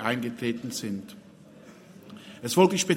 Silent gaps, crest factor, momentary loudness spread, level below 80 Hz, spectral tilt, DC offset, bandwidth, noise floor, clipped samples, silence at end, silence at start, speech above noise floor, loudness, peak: none; 22 dB; 27 LU; -70 dBFS; -4.5 dB/octave; under 0.1%; 16.5 kHz; -50 dBFS; under 0.1%; 0 s; 0 s; 24 dB; -27 LUFS; -6 dBFS